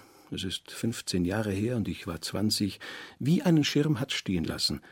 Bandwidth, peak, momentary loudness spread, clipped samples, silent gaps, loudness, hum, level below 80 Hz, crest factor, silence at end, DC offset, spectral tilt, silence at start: 16.5 kHz; -12 dBFS; 11 LU; under 0.1%; none; -29 LUFS; none; -56 dBFS; 16 dB; 0.1 s; under 0.1%; -5 dB/octave; 0.3 s